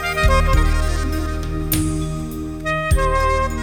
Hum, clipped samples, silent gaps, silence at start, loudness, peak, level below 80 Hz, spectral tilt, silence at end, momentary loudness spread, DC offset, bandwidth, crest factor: none; under 0.1%; none; 0 s; -20 LUFS; -2 dBFS; -20 dBFS; -5 dB/octave; 0 s; 9 LU; under 0.1%; 17.5 kHz; 16 dB